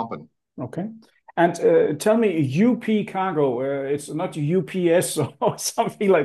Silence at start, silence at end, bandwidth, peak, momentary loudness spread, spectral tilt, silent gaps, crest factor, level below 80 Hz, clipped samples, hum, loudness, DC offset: 0 s; 0 s; 12.5 kHz; -6 dBFS; 13 LU; -5.5 dB/octave; none; 16 dB; -70 dBFS; under 0.1%; none; -22 LUFS; under 0.1%